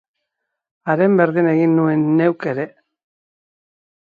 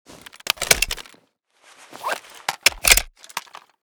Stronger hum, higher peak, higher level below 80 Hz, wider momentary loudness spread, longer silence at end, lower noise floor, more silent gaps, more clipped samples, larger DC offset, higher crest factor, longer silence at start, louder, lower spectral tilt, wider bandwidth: neither; about the same, -2 dBFS vs 0 dBFS; second, -68 dBFS vs -38 dBFS; second, 11 LU vs 18 LU; first, 1.35 s vs 0.45 s; first, -78 dBFS vs -61 dBFS; neither; neither; neither; second, 18 dB vs 24 dB; first, 0.85 s vs 0.6 s; first, -16 LUFS vs -19 LUFS; first, -10.5 dB/octave vs 0.5 dB/octave; second, 4.9 kHz vs over 20 kHz